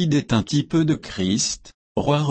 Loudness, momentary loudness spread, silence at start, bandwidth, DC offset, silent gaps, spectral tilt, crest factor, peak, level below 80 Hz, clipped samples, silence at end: -22 LUFS; 6 LU; 0 s; 8.8 kHz; under 0.1%; 1.74-1.95 s; -5 dB/octave; 14 dB; -8 dBFS; -46 dBFS; under 0.1%; 0 s